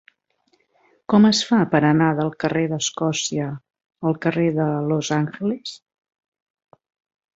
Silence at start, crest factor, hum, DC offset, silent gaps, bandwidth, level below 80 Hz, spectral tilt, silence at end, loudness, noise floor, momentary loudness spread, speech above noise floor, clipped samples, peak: 1.1 s; 20 dB; none; under 0.1%; none; 8 kHz; -62 dBFS; -5 dB/octave; 1.6 s; -20 LUFS; -66 dBFS; 12 LU; 47 dB; under 0.1%; -2 dBFS